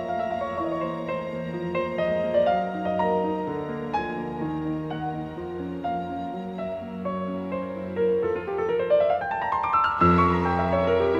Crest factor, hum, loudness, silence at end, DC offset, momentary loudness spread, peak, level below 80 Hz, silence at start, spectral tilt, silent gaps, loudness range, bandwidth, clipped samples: 18 dB; none; -26 LUFS; 0 s; under 0.1%; 10 LU; -8 dBFS; -50 dBFS; 0 s; -8.5 dB/octave; none; 8 LU; 7.8 kHz; under 0.1%